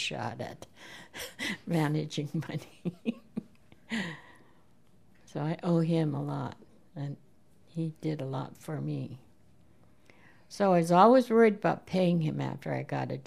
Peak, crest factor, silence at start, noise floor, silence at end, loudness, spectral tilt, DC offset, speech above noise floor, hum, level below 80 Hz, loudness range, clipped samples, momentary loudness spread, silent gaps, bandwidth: -6 dBFS; 24 dB; 0 s; -64 dBFS; 0.05 s; -30 LUFS; -6.5 dB/octave; 0.1%; 35 dB; none; -70 dBFS; 13 LU; under 0.1%; 20 LU; none; 14 kHz